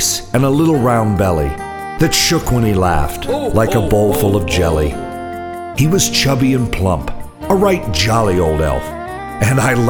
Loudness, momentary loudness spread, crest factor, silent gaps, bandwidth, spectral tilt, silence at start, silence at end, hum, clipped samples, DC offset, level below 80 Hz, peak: -15 LUFS; 12 LU; 14 dB; none; over 20 kHz; -5 dB/octave; 0 s; 0 s; none; under 0.1%; under 0.1%; -28 dBFS; 0 dBFS